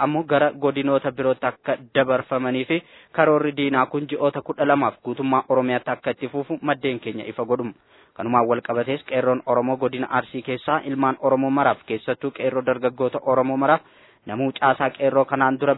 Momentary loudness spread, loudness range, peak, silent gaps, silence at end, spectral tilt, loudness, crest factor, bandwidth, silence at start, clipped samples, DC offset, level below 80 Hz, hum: 7 LU; 3 LU; -2 dBFS; none; 0 s; -10 dB/octave; -22 LUFS; 20 dB; 4.1 kHz; 0 s; under 0.1%; under 0.1%; -66 dBFS; none